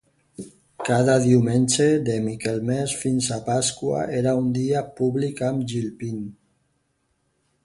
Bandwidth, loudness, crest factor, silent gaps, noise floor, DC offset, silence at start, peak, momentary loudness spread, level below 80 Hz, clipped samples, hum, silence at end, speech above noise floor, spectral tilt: 11.5 kHz; -22 LUFS; 18 dB; none; -70 dBFS; under 0.1%; 0.4 s; -4 dBFS; 14 LU; -56 dBFS; under 0.1%; none; 1.3 s; 49 dB; -5.5 dB/octave